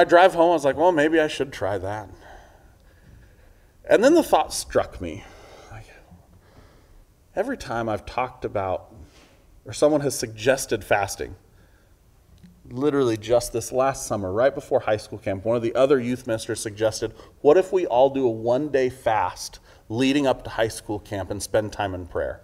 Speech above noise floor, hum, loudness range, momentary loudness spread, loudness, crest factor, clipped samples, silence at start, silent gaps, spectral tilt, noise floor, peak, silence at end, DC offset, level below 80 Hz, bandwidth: 34 dB; none; 9 LU; 14 LU; -23 LUFS; 22 dB; under 0.1%; 0 s; none; -5 dB/octave; -56 dBFS; -2 dBFS; 0.05 s; under 0.1%; -50 dBFS; 16 kHz